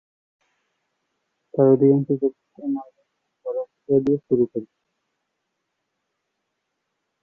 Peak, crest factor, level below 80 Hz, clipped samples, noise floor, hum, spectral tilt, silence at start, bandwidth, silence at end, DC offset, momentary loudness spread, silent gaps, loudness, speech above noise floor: -4 dBFS; 20 dB; -66 dBFS; under 0.1%; -78 dBFS; none; -12 dB/octave; 1.55 s; 2.6 kHz; 2.6 s; under 0.1%; 15 LU; none; -21 LUFS; 58 dB